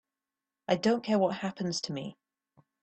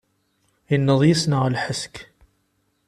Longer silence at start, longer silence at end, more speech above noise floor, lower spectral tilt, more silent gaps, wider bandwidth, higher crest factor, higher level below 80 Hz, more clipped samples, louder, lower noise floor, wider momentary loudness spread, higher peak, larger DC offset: about the same, 0.7 s vs 0.7 s; second, 0.7 s vs 0.85 s; first, over 60 dB vs 49 dB; about the same, -5 dB/octave vs -5.5 dB/octave; neither; second, 8.8 kHz vs 13.5 kHz; about the same, 22 dB vs 18 dB; second, -72 dBFS vs -56 dBFS; neither; second, -30 LUFS vs -20 LUFS; first, under -90 dBFS vs -69 dBFS; about the same, 14 LU vs 15 LU; second, -12 dBFS vs -4 dBFS; neither